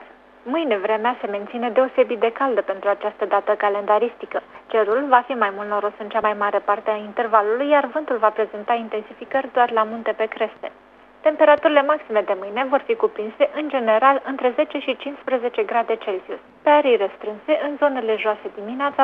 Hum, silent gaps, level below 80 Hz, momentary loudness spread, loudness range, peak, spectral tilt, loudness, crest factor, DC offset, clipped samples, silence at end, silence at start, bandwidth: none; none; -68 dBFS; 10 LU; 2 LU; 0 dBFS; -6.5 dB/octave; -21 LUFS; 20 dB; under 0.1%; under 0.1%; 0 s; 0 s; 4.9 kHz